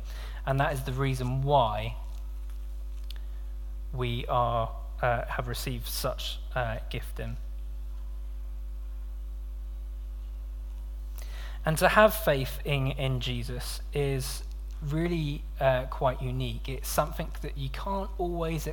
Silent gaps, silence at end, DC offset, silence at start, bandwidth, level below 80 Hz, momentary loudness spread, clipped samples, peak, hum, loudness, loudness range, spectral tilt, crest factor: none; 0 s; under 0.1%; 0 s; 19 kHz; -36 dBFS; 15 LU; under 0.1%; -6 dBFS; none; -31 LUFS; 13 LU; -5.5 dB/octave; 24 dB